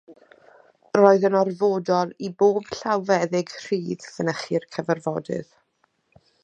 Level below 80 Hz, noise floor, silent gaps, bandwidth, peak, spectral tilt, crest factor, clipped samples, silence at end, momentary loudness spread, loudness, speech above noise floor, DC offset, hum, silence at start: -68 dBFS; -69 dBFS; none; 8.6 kHz; -2 dBFS; -6 dB/octave; 22 dB; under 0.1%; 1 s; 11 LU; -23 LUFS; 47 dB; under 0.1%; none; 0.1 s